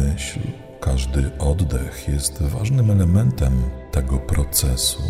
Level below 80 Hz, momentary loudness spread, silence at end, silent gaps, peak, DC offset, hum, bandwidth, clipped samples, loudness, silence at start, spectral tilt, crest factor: -24 dBFS; 9 LU; 0 s; none; -4 dBFS; under 0.1%; none; 16 kHz; under 0.1%; -21 LUFS; 0 s; -5 dB/octave; 16 dB